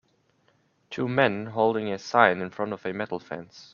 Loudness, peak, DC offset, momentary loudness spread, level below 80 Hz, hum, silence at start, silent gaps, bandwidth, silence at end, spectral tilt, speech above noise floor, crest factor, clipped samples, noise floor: -25 LUFS; -2 dBFS; under 0.1%; 15 LU; -68 dBFS; none; 0.9 s; none; 7.2 kHz; 0.1 s; -6 dB/octave; 41 dB; 26 dB; under 0.1%; -67 dBFS